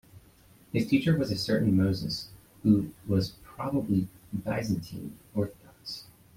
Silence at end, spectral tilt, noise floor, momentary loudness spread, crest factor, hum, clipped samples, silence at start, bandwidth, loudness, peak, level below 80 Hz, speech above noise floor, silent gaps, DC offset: 0.35 s; -7 dB/octave; -58 dBFS; 15 LU; 20 dB; none; under 0.1%; 0.15 s; 16.5 kHz; -29 LUFS; -10 dBFS; -56 dBFS; 30 dB; none; under 0.1%